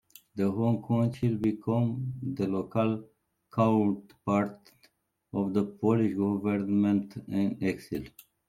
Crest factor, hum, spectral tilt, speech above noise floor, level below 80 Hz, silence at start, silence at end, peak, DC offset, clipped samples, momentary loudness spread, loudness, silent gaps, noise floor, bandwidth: 18 dB; none; -9 dB/octave; 39 dB; -64 dBFS; 0.35 s; 0.4 s; -12 dBFS; under 0.1%; under 0.1%; 10 LU; -29 LUFS; none; -67 dBFS; 15 kHz